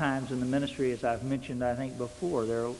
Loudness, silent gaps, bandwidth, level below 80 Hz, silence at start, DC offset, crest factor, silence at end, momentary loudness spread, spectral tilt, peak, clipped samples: -32 LUFS; none; 11.5 kHz; -56 dBFS; 0 s; under 0.1%; 16 dB; 0 s; 4 LU; -6.5 dB/octave; -14 dBFS; under 0.1%